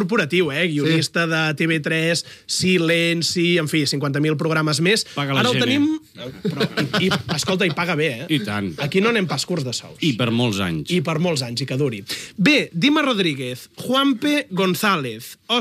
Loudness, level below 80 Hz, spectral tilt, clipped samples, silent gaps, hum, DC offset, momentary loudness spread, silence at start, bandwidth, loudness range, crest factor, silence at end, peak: -20 LUFS; -60 dBFS; -4.5 dB/octave; under 0.1%; none; none; under 0.1%; 7 LU; 0 s; 16 kHz; 2 LU; 16 dB; 0 s; -4 dBFS